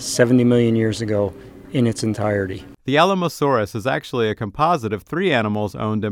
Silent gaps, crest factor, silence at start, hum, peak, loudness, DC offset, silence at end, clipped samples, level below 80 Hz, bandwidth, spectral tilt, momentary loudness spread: none; 18 dB; 0 s; none; 0 dBFS; -20 LUFS; under 0.1%; 0 s; under 0.1%; -50 dBFS; 16 kHz; -5.5 dB/octave; 8 LU